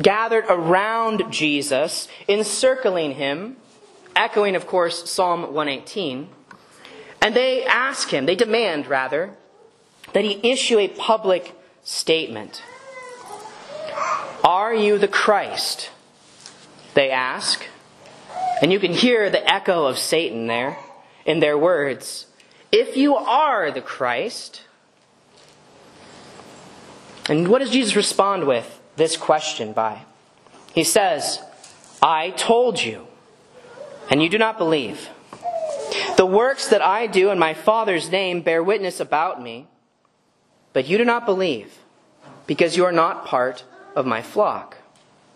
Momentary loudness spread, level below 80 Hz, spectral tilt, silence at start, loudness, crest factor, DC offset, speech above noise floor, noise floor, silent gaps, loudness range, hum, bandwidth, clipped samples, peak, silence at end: 16 LU; -66 dBFS; -3.5 dB/octave; 0 s; -20 LUFS; 22 dB; under 0.1%; 44 dB; -63 dBFS; none; 4 LU; none; 13 kHz; under 0.1%; 0 dBFS; 0.6 s